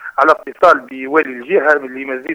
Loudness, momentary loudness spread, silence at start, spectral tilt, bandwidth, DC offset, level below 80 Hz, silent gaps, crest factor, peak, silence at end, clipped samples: -14 LUFS; 6 LU; 0 s; -5 dB/octave; 15.5 kHz; under 0.1%; -58 dBFS; none; 14 dB; 0 dBFS; 0 s; 0.1%